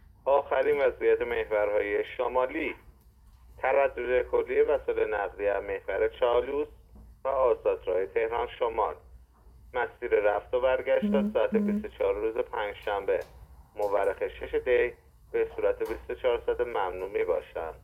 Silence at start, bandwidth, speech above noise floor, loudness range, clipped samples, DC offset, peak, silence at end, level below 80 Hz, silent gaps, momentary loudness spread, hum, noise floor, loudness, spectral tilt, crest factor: 0.25 s; 14 kHz; 28 dB; 2 LU; under 0.1%; under 0.1%; -12 dBFS; 0.05 s; -52 dBFS; none; 7 LU; none; -56 dBFS; -29 LUFS; -7 dB/octave; 16 dB